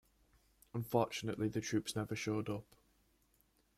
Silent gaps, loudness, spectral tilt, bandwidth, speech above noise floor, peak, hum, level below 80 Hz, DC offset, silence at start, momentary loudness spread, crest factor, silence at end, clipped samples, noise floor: none; -39 LUFS; -5.5 dB/octave; 16 kHz; 36 dB; -20 dBFS; none; -70 dBFS; under 0.1%; 0.75 s; 9 LU; 22 dB; 1.15 s; under 0.1%; -75 dBFS